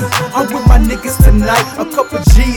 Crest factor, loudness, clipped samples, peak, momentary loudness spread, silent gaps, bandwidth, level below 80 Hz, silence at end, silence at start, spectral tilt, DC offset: 10 dB; -12 LUFS; 0.9%; 0 dBFS; 6 LU; none; 19 kHz; -12 dBFS; 0 s; 0 s; -5.5 dB/octave; under 0.1%